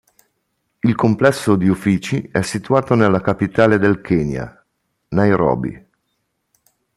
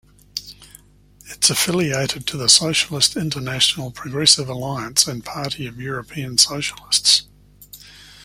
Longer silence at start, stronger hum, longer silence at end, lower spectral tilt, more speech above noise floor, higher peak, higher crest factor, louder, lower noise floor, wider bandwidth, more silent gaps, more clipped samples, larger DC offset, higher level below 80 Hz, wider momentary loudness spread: first, 0.85 s vs 0.35 s; second, none vs 50 Hz at -45 dBFS; first, 1.2 s vs 0 s; first, -7 dB/octave vs -2 dB/octave; first, 55 dB vs 30 dB; about the same, 0 dBFS vs 0 dBFS; about the same, 18 dB vs 22 dB; about the same, -17 LUFS vs -17 LUFS; first, -71 dBFS vs -50 dBFS; second, 13 kHz vs 16.5 kHz; neither; neither; neither; first, -46 dBFS vs -52 dBFS; second, 9 LU vs 15 LU